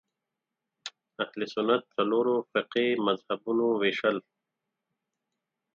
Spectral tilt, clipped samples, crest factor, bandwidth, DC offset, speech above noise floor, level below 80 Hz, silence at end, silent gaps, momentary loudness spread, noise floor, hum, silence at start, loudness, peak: -5.5 dB/octave; under 0.1%; 18 dB; 7.6 kHz; under 0.1%; 59 dB; -80 dBFS; 1.55 s; none; 13 LU; -87 dBFS; none; 0.85 s; -28 LUFS; -12 dBFS